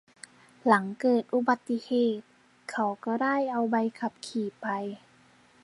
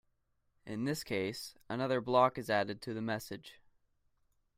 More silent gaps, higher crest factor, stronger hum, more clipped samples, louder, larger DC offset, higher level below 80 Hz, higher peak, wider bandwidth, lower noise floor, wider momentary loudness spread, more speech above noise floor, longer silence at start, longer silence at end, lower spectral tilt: neither; about the same, 24 dB vs 22 dB; neither; neither; first, -28 LUFS vs -35 LUFS; neither; second, -80 dBFS vs -70 dBFS; first, -6 dBFS vs -14 dBFS; second, 11.5 kHz vs 16 kHz; second, -60 dBFS vs -78 dBFS; second, 12 LU vs 16 LU; second, 32 dB vs 43 dB; about the same, 0.65 s vs 0.65 s; second, 0.65 s vs 1.05 s; about the same, -6 dB/octave vs -5 dB/octave